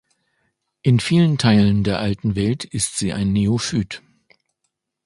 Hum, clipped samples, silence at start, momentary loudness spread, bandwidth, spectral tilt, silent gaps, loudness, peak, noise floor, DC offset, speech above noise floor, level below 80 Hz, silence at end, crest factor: none; under 0.1%; 0.85 s; 8 LU; 11.5 kHz; -5.5 dB/octave; none; -19 LUFS; -2 dBFS; -75 dBFS; under 0.1%; 57 dB; -44 dBFS; 1.1 s; 18 dB